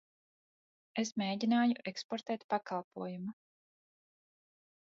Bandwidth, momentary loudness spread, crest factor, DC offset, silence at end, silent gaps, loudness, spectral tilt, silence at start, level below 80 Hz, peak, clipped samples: 7.4 kHz; 13 LU; 18 dB; under 0.1%; 1.55 s; 2.04-2.09 s, 2.44-2.49 s, 2.84-2.91 s; -36 LUFS; -4 dB/octave; 0.95 s; -84 dBFS; -20 dBFS; under 0.1%